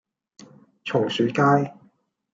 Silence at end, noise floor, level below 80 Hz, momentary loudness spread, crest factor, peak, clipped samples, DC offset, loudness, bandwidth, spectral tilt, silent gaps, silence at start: 0.6 s; -60 dBFS; -70 dBFS; 13 LU; 18 dB; -6 dBFS; under 0.1%; under 0.1%; -22 LUFS; 7.8 kHz; -6.5 dB/octave; none; 0.85 s